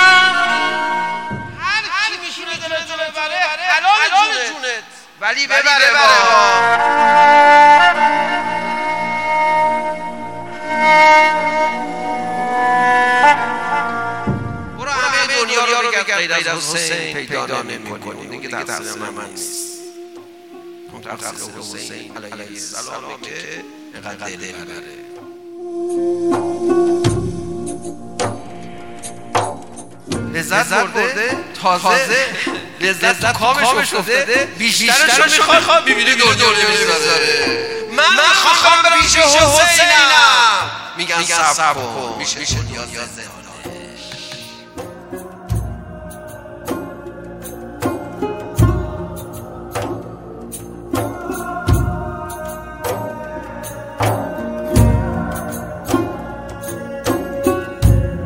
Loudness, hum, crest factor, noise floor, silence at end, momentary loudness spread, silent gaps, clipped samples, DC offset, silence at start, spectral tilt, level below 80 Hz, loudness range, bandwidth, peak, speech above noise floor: -14 LUFS; none; 16 dB; -37 dBFS; 0 s; 22 LU; none; under 0.1%; under 0.1%; 0 s; -3 dB/octave; -34 dBFS; 19 LU; 16.5 kHz; 0 dBFS; 23 dB